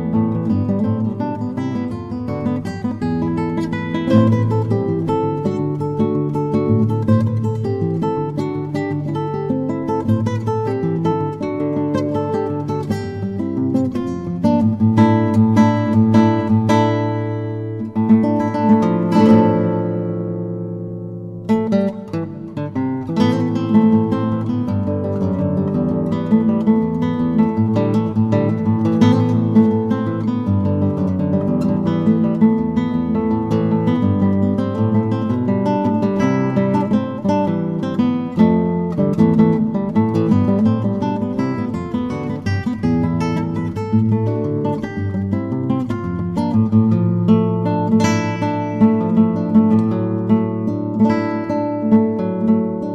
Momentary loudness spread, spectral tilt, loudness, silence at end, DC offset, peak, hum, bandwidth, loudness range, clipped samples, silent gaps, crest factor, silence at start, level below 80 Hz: 8 LU; -9 dB/octave; -18 LUFS; 0 s; under 0.1%; -2 dBFS; none; 7.8 kHz; 5 LU; under 0.1%; none; 14 dB; 0 s; -48 dBFS